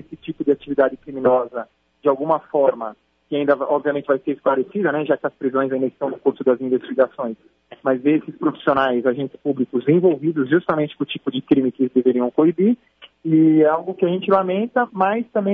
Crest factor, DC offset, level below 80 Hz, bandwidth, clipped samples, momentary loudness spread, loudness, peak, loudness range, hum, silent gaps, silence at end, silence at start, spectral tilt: 16 dB; under 0.1%; -64 dBFS; 3.9 kHz; under 0.1%; 9 LU; -20 LUFS; -2 dBFS; 3 LU; none; none; 0 s; 0.1 s; -10 dB/octave